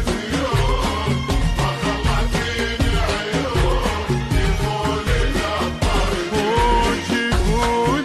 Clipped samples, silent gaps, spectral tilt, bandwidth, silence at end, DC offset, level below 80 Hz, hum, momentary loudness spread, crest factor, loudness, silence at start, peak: under 0.1%; none; -5 dB/octave; 13 kHz; 0 s; under 0.1%; -24 dBFS; none; 3 LU; 12 dB; -20 LUFS; 0 s; -6 dBFS